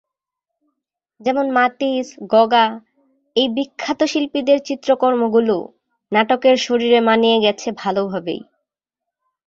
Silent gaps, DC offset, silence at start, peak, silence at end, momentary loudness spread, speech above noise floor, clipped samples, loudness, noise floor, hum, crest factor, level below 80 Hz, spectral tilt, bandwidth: none; under 0.1%; 1.2 s; -2 dBFS; 1.05 s; 10 LU; 67 dB; under 0.1%; -17 LUFS; -84 dBFS; none; 16 dB; -64 dBFS; -4.5 dB/octave; 7.8 kHz